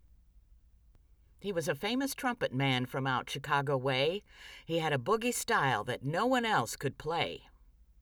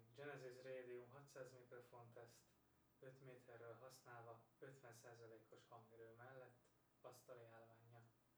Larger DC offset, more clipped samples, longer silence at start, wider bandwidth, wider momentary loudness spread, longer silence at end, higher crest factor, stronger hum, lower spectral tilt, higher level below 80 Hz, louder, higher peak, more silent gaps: neither; neither; first, 1.4 s vs 0 s; about the same, over 20 kHz vs over 20 kHz; about the same, 8 LU vs 10 LU; first, 0.6 s vs 0 s; about the same, 18 dB vs 20 dB; neither; about the same, -4.5 dB/octave vs -5 dB/octave; first, -62 dBFS vs under -90 dBFS; first, -32 LUFS vs -63 LUFS; first, -16 dBFS vs -44 dBFS; neither